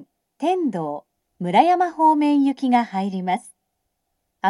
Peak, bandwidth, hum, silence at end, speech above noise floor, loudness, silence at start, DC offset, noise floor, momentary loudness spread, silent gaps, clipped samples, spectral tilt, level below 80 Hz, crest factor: -2 dBFS; 11.5 kHz; none; 0 s; 56 dB; -20 LUFS; 0 s; under 0.1%; -76 dBFS; 12 LU; none; under 0.1%; -6.5 dB/octave; -76 dBFS; 20 dB